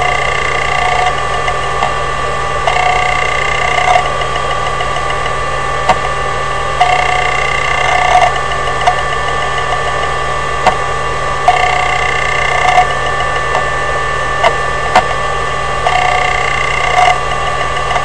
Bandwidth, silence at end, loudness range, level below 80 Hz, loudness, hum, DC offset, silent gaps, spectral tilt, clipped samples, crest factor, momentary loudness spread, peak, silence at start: 11 kHz; 0 s; 2 LU; -28 dBFS; -13 LUFS; none; 9%; none; -3 dB/octave; 0.3%; 14 dB; 5 LU; 0 dBFS; 0 s